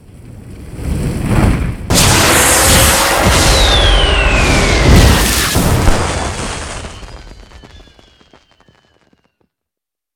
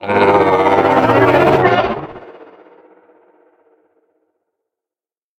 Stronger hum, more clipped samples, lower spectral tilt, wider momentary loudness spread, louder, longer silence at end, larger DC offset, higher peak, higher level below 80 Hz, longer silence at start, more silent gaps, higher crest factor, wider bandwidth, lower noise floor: neither; first, 0.1% vs under 0.1%; second, -3.5 dB/octave vs -7 dB/octave; first, 15 LU vs 10 LU; about the same, -10 LUFS vs -12 LUFS; second, 2.8 s vs 3.1 s; neither; about the same, 0 dBFS vs 0 dBFS; first, -18 dBFS vs -48 dBFS; first, 0.25 s vs 0 s; neither; about the same, 12 dB vs 16 dB; first, 19.5 kHz vs 16.5 kHz; second, -84 dBFS vs under -90 dBFS